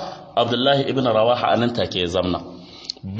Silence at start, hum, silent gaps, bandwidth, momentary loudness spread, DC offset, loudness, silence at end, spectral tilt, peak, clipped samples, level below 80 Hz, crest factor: 0 s; none; none; 8 kHz; 14 LU; under 0.1%; -20 LUFS; 0 s; -6 dB/octave; -4 dBFS; under 0.1%; -52 dBFS; 16 dB